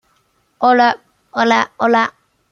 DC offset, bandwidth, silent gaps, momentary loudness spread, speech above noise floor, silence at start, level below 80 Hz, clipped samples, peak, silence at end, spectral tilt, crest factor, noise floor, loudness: under 0.1%; 7.2 kHz; none; 11 LU; 47 dB; 0.6 s; -66 dBFS; under 0.1%; -2 dBFS; 0.4 s; -4 dB/octave; 16 dB; -61 dBFS; -15 LUFS